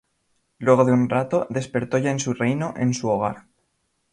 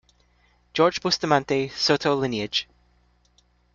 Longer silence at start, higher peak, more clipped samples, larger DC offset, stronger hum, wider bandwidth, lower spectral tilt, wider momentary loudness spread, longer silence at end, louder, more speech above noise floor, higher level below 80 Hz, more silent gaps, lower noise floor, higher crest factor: second, 0.6 s vs 0.75 s; about the same, -2 dBFS vs -4 dBFS; neither; neither; second, none vs 60 Hz at -55 dBFS; first, 10.5 kHz vs 7.6 kHz; first, -6.5 dB/octave vs -4 dB/octave; about the same, 9 LU vs 7 LU; second, 0.75 s vs 1.1 s; about the same, -22 LUFS vs -23 LUFS; first, 50 dB vs 40 dB; about the same, -58 dBFS vs -60 dBFS; neither; first, -71 dBFS vs -63 dBFS; about the same, 20 dB vs 22 dB